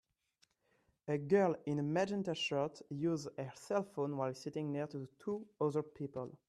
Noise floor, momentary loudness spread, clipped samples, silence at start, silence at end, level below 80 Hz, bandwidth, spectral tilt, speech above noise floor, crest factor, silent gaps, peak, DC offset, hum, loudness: -77 dBFS; 11 LU; under 0.1%; 1.05 s; 0.15 s; -78 dBFS; 12.5 kHz; -6.5 dB/octave; 40 dB; 20 dB; none; -20 dBFS; under 0.1%; none; -38 LUFS